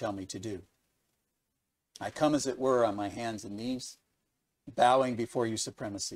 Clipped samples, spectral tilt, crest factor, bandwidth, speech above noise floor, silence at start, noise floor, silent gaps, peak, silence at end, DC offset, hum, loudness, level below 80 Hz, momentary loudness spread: under 0.1%; -4.5 dB/octave; 20 dB; 15.5 kHz; 52 dB; 0 s; -83 dBFS; none; -12 dBFS; 0 s; under 0.1%; none; -31 LUFS; -66 dBFS; 16 LU